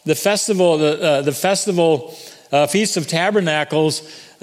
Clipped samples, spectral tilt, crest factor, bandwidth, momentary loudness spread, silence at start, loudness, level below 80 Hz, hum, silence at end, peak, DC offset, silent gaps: under 0.1%; -4 dB/octave; 16 dB; 16 kHz; 5 LU; 0.05 s; -17 LUFS; -68 dBFS; none; 0.2 s; 0 dBFS; under 0.1%; none